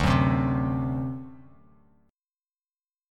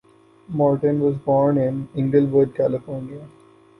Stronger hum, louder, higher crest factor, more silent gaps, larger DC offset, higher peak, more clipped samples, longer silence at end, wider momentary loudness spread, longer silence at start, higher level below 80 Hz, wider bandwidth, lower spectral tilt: neither; second, -26 LUFS vs -20 LUFS; about the same, 20 dB vs 16 dB; neither; neither; about the same, -8 dBFS vs -6 dBFS; neither; first, 1.75 s vs 0.5 s; first, 17 LU vs 14 LU; second, 0 s vs 0.5 s; first, -40 dBFS vs -56 dBFS; first, 10 kHz vs 5.4 kHz; second, -7.5 dB/octave vs -11 dB/octave